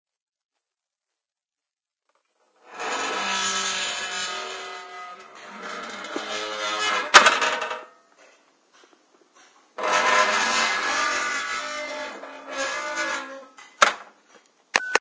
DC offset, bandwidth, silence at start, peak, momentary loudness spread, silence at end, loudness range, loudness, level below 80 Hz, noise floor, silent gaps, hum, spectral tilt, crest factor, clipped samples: under 0.1%; 8 kHz; 2.65 s; 0 dBFS; 19 LU; 0 s; 8 LU; -23 LUFS; -66 dBFS; -90 dBFS; none; none; 0.5 dB/octave; 26 dB; under 0.1%